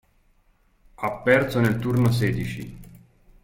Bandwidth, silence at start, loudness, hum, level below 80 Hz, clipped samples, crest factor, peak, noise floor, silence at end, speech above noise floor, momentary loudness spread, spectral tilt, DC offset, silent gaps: 16.5 kHz; 1 s; -23 LUFS; none; -46 dBFS; under 0.1%; 20 dB; -4 dBFS; -62 dBFS; 0.5 s; 40 dB; 13 LU; -7 dB/octave; under 0.1%; none